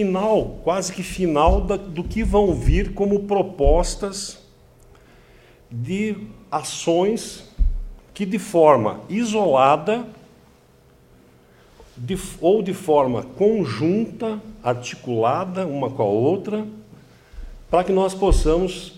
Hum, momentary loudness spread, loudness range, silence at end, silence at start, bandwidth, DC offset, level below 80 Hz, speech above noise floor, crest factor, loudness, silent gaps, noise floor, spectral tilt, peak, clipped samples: none; 11 LU; 6 LU; 0 s; 0 s; 15 kHz; under 0.1%; -30 dBFS; 33 dB; 20 dB; -21 LUFS; none; -53 dBFS; -6 dB/octave; -2 dBFS; under 0.1%